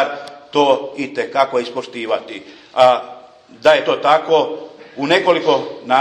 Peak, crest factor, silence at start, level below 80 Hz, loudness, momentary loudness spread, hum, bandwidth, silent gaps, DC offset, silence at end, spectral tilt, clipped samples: 0 dBFS; 16 dB; 0 s; -64 dBFS; -16 LUFS; 15 LU; none; 11 kHz; none; under 0.1%; 0 s; -4.5 dB/octave; under 0.1%